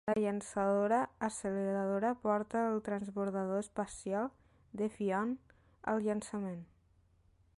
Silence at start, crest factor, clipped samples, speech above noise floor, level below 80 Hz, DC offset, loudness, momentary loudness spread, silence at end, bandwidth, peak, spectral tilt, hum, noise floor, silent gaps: 0.05 s; 16 dB; under 0.1%; 34 dB; -68 dBFS; under 0.1%; -36 LUFS; 8 LU; 0.95 s; 11.5 kHz; -20 dBFS; -6.5 dB/octave; none; -69 dBFS; none